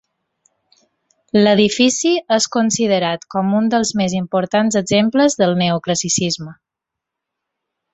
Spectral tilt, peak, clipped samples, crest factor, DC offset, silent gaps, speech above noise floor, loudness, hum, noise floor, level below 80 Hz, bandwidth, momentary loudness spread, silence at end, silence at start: -4 dB/octave; -2 dBFS; under 0.1%; 16 dB; under 0.1%; none; 67 dB; -16 LUFS; none; -83 dBFS; -56 dBFS; 8.4 kHz; 6 LU; 1.4 s; 1.35 s